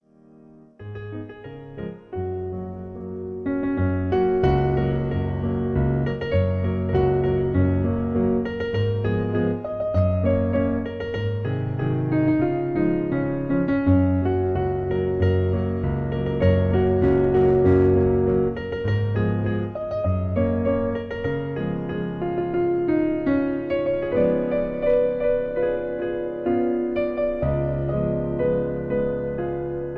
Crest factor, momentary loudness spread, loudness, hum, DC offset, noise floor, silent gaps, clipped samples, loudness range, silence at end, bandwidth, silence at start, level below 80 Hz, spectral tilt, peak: 16 dB; 9 LU; -23 LUFS; none; under 0.1%; -51 dBFS; none; under 0.1%; 5 LU; 0 s; 4.8 kHz; 0.8 s; -38 dBFS; -10.5 dB/octave; -6 dBFS